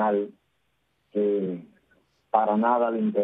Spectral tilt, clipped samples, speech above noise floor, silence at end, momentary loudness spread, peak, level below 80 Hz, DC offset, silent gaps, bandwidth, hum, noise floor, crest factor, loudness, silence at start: -10.5 dB/octave; under 0.1%; 49 dB; 0 s; 11 LU; -6 dBFS; -80 dBFS; under 0.1%; none; 3.9 kHz; none; -73 dBFS; 20 dB; -25 LUFS; 0 s